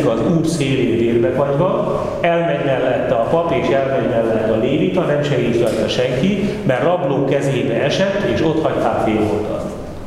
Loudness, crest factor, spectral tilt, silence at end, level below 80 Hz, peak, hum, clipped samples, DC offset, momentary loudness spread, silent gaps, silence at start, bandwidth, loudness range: -17 LUFS; 16 dB; -6.5 dB/octave; 0 s; -40 dBFS; 0 dBFS; none; under 0.1%; under 0.1%; 2 LU; none; 0 s; 14 kHz; 0 LU